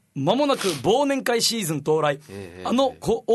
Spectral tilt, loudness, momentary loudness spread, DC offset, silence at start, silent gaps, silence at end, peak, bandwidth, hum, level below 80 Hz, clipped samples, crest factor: -4 dB/octave; -22 LUFS; 6 LU; under 0.1%; 0.15 s; none; 0 s; -6 dBFS; 12.5 kHz; none; -56 dBFS; under 0.1%; 16 dB